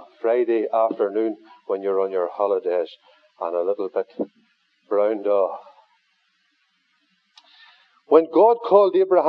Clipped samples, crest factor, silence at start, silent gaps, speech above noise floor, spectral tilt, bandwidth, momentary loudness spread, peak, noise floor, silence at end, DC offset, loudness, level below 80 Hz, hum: under 0.1%; 20 dB; 0 s; none; 47 dB; -8 dB/octave; 5.4 kHz; 14 LU; -2 dBFS; -67 dBFS; 0 s; under 0.1%; -21 LUFS; under -90 dBFS; none